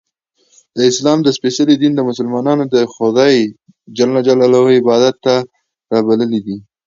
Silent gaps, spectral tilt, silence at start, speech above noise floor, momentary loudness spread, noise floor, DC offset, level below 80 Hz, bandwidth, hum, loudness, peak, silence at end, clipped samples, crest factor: none; -5.5 dB/octave; 0.75 s; 47 dB; 8 LU; -59 dBFS; under 0.1%; -60 dBFS; 7.6 kHz; none; -13 LUFS; 0 dBFS; 0.25 s; under 0.1%; 14 dB